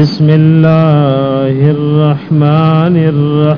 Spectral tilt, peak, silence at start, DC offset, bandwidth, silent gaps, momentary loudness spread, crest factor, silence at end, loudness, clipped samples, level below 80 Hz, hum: -10 dB/octave; 0 dBFS; 0 s; under 0.1%; 5.4 kHz; none; 4 LU; 8 dB; 0 s; -9 LUFS; 2%; -46 dBFS; none